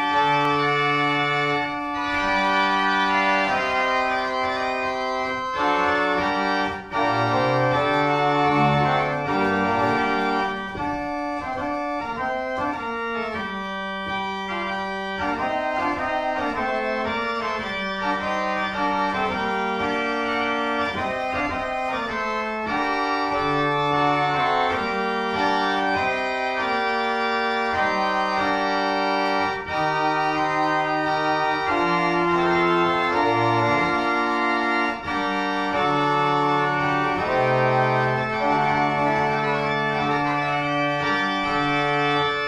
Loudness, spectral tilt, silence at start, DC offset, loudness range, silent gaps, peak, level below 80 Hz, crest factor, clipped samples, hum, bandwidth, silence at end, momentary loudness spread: -22 LUFS; -5.5 dB/octave; 0 s; under 0.1%; 5 LU; none; -6 dBFS; -50 dBFS; 16 dB; under 0.1%; none; 11.5 kHz; 0 s; 6 LU